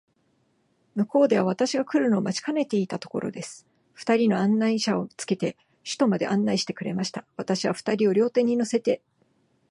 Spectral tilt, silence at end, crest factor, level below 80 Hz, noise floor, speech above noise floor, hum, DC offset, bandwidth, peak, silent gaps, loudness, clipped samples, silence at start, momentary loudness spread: -5.5 dB/octave; 0.75 s; 16 dB; -72 dBFS; -68 dBFS; 44 dB; none; under 0.1%; 11.5 kHz; -8 dBFS; none; -25 LUFS; under 0.1%; 0.95 s; 10 LU